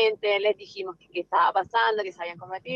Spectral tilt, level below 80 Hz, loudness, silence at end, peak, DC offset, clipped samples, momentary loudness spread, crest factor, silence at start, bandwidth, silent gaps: -4.5 dB/octave; -74 dBFS; -25 LUFS; 0 s; -10 dBFS; under 0.1%; under 0.1%; 14 LU; 16 dB; 0 s; 7.2 kHz; none